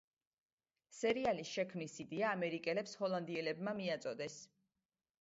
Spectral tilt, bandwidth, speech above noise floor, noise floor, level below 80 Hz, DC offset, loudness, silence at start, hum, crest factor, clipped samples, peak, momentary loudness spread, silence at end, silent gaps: -3.5 dB/octave; 7.6 kHz; over 50 dB; under -90 dBFS; -78 dBFS; under 0.1%; -40 LUFS; 0.9 s; none; 18 dB; under 0.1%; -24 dBFS; 9 LU; 0.75 s; none